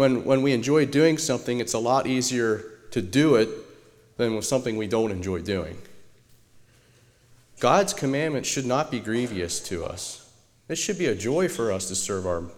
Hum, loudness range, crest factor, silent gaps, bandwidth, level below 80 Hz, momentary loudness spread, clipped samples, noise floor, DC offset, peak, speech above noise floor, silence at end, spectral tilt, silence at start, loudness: none; 6 LU; 20 dB; none; 17 kHz; -56 dBFS; 11 LU; under 0.1%; -58 dBFS; under 0.1%; -6 dBFS; 34 dB; 0 s; -4.5 dB/octave; 0 s; -25 LUFS